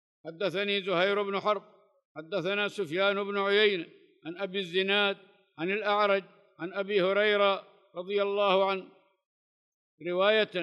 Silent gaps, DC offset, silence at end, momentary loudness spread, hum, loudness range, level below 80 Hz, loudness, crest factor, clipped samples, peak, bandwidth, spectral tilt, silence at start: 2.05-2.15 s, 9.26-9.98 s; under 0.1%; 0 s; 17 LU; none; 2 LU; under -90 dBFS; -28 LUFS; 18 dB; under 0.1%; -12 dBFS; 10.5 kHz; -5.5 dB/octave; 0.25 s